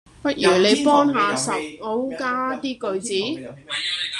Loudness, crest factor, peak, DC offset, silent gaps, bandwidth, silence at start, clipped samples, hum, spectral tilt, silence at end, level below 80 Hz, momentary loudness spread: -21 LUFS; 18 dB; -4 dBFS; under 0.1%; none; 12.5 kHz; 0.2 s; under 0.1%; none; -3.5 dB/octave; 0 s; -60 dBFS; 11 LU